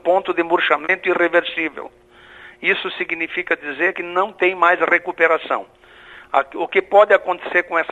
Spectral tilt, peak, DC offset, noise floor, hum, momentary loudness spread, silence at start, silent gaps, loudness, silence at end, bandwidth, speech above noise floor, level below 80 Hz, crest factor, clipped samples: -5 dB/octave; 0 dBFS; under 0.1%; -43 dBFS; none; 9 LU; 0.05 s; none; -18 LUFS; 0 s; 8 kHz; 25 dB; -62 dBFS; 18 dB; under 0.1%